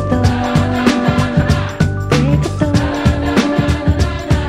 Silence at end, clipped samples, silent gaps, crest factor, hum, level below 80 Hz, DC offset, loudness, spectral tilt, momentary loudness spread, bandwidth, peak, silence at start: 0 s; under 0.1%; none; 14 dB; none; -26 dBFS; under 0.1%; -15 LUFS; -6.5 dB/octave; 2 LU; 13.5 kHz; 0 dBFS; 0 s